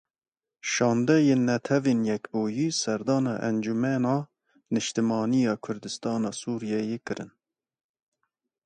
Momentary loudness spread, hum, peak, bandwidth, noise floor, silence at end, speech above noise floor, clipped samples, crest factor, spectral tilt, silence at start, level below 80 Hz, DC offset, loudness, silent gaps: 11 LU; none; -8 dBFS; 9.6 kHz; under -90 dBFS; 1.4 s; over 64 dB; under 0.1%; 18 dB; -5.5 dB/octave; 0.65 s; -70 dBFS; under 0.1%; -26 LUFS; none